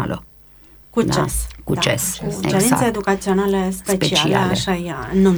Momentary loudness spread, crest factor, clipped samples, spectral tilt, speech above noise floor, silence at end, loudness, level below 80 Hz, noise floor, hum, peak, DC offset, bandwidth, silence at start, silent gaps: 8 LU; 18 dB; under 0.1%; -4.5 dB/octave; 28 dB; 0 s; -19 LUFS; -36 dBFS; -46 dBFS; none; -2 dBFS; under 0.1%; over 20 kHz; 0 s; none